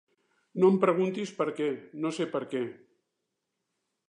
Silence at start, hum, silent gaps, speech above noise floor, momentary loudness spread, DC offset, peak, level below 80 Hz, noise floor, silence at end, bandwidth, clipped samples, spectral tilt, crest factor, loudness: 0.55 s; none; none; 55 dB; 11 LU; under 0.1%; -12 dBFS; -84 dBFS; -83 dBFS; 1.35 s; 10 kHz; under 0.1%; -7 dB/octave; 20 dB; -29 LUFS